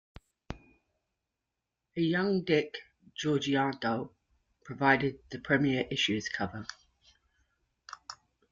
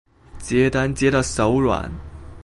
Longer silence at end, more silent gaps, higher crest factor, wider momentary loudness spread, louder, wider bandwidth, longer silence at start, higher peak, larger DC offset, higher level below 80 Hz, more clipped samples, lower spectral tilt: first, 0.35 s vs 0 s; neither; first, 24 dB vs 16 dB; about the same, 20 LU vs 18 LU; second, -30 LUFS vs -20 LUFS; second, 7.6 kHz vs 11.5 kHz; first, 0.5 s vs 0.35 s; second, -10 dBFS vs -6 dBFS; neither; second, -62 dBFS vs -36 dBFS; neither; about the same, -5 dB/octave vs -5.5 dB/octave